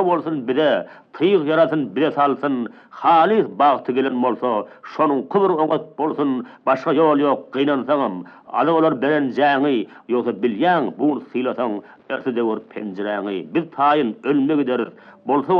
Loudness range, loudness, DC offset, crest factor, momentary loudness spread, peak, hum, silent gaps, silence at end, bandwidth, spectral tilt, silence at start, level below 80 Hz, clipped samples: 4 LU; -19 LUFS; under 0.1%; 16 dB; 9 LU; -4 dBFS; none; none; 0 s; 6 kHz; -8 dB/octave; 0 s; -78 dBFS; under 0.1%